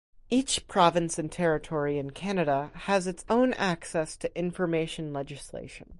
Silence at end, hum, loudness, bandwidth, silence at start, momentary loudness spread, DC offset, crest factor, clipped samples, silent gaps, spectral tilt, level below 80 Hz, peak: 0.05 s; none; -28 LUFS; 11.5 kHz; 0.3 s; 11 LU; under 0.1%; 22 dB; under 0.1%; none; -4.5 dB/octave; -54 dBFS; -8 dBFS